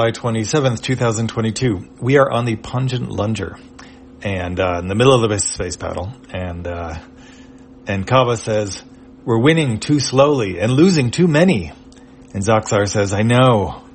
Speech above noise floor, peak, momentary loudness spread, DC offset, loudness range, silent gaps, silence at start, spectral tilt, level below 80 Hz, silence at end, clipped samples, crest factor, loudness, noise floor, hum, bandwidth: 25 dB; 0 dBFS; 15 LU; under 0.1%; 6 LU; none; 0 s; -5.5 dB/octave; -46 dBFS; 0.1 s; under 0.1%; 18 dB; -17 LUFS; -42 dBFS; none; 8.8 kHz